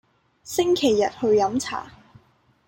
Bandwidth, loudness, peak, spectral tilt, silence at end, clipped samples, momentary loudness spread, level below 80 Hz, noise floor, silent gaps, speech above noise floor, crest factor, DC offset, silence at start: 17 kHz; -22 LUFS; -8 dBFS; -4 dB/octave; 0.75 s; under 0.1%; 10 LU; -60 dBFS; -61 dBFS; none; 39 dB; 16 dB; under 0.1%; 0.45 s